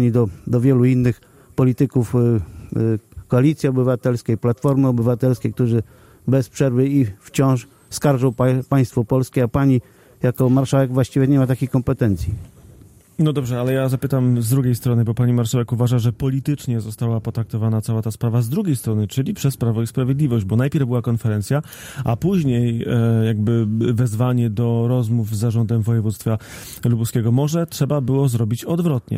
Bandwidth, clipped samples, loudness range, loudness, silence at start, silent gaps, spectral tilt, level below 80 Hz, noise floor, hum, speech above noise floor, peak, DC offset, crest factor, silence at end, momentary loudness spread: 16 kHz; under 0.1%; 2 LU; -19 LUFS; 0 s; none; -7.5 dB/octave; -46 dBFS; -46 dBFS; none; 28 dB; -6 dBFS; under 0.1%; 14 dB; 0 s; 6 LU